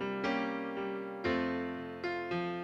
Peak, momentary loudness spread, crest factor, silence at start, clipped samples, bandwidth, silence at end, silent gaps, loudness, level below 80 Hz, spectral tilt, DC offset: -22 dBFS; 5 LU; 14 dB; 0 s; under 0.1%; 7.8 kHz; 0 s; none; -36 LUFS; -66 dBFS; -6.5 dB/octave; under 0.1%